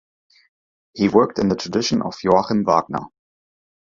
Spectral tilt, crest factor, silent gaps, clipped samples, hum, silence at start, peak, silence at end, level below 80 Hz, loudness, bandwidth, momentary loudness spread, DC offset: -5.5 dB/octave; 20 dB; none; under 0.1%; none; 0.95 s; 0 dBFS; 0.9 s; -52 dBFS; -19 LUFS; 7.6 kHz; 10 LU; under 0.1%